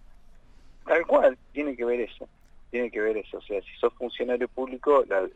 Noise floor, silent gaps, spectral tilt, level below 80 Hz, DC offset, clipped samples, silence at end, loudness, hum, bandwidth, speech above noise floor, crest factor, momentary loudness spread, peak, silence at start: -50 dBFS; none; -5.5 dB/octave; -54 dBFS; under 0.1%; under 0.1%; 0.05 s; -27 LUFS; none; 8 kHz; 23 dB; 18 dB; 13 LU; -8 dBFS; 0.85 s